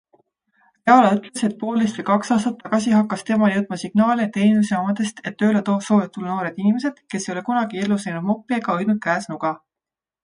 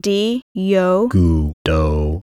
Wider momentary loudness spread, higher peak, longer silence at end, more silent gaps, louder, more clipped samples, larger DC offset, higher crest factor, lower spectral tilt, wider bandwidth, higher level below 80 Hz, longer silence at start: first, 9 LU vs 5 LU; first, 0 dBFS vs -4 dBFS; first, 0.7 s vs 0 s; second, none vs 0.42-0.55 s, 1.53-1.65 s; second, -20 LUFS vs -17 LUFS; neither; neither; first, 20 dB vs 12 dB; about the same, -6 dB/octave vs -7 dB/octave; second, 10.5 kHz vs 13 kHz; second, -66 dBFS vs -24 dBFS; first, 0.85 s vs 0.05 s